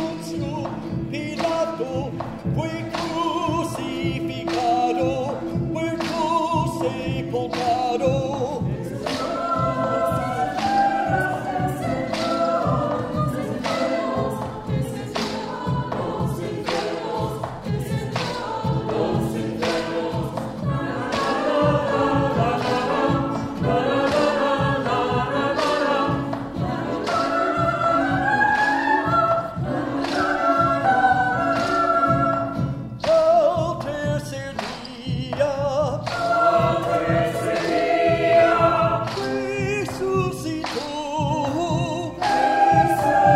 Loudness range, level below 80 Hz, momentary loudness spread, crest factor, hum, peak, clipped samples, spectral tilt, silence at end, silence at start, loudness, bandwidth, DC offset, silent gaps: 6 LU; -46 dBFS; 9 LU; 18 dB; none; -4 dBFS; under 0.1%; -6 dB/octave; 0 s; 0 s; -22 LUFS; 16 kHz; under 0.1%; none